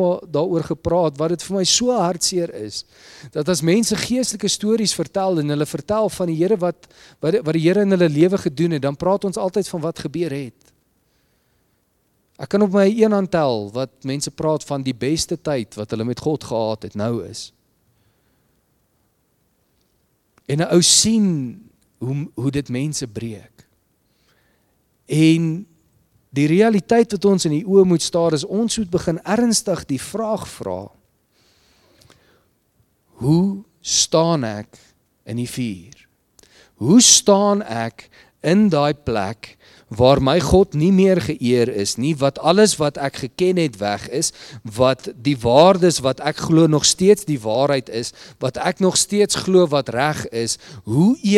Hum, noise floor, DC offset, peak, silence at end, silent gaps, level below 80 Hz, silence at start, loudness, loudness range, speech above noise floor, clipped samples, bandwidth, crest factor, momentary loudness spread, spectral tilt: none; -65 dBFS; under 0.1%; 0 dBFS; 0 s; none; -48 dBFS; 0 s; -18 LUFS; 10 LU; 47 dB; under 0.1%; 16 kHz; 20 dB; 13 LU; -4.5 dB/octave